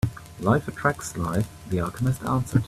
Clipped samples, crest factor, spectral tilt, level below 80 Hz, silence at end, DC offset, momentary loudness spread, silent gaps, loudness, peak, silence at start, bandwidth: under 0.1%; 20 dB; -6.5 dB/octave; -46 dBFS; 0 s; under 0.1%; 5 LU; none; -26 LUFS; -6 dBFS; 0.05 s; 15 kHz